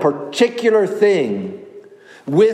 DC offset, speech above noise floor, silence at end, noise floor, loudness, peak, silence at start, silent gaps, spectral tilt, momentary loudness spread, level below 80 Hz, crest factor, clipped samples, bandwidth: under 0.1%; 26 dB; 0 s; -42 dBFS; -17 LUFS; -2 dBFS; 0 s; none; -5.5 dB/octave; 17 LU; -72 dBFS; 16 dB; under 0.1%; 12 kHz